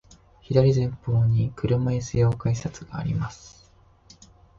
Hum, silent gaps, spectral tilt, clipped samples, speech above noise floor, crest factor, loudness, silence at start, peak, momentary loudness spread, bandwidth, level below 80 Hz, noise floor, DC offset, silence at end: none; none; -7.5 dB/octave; under 0.1%; 33 dB; 18 dB; -24 LUFS; 0.5 s; -8 dBFS; 12 LU; 7.6 kHz; -46 dBFS; -56 dBFS; under 0.1%; 1.1 s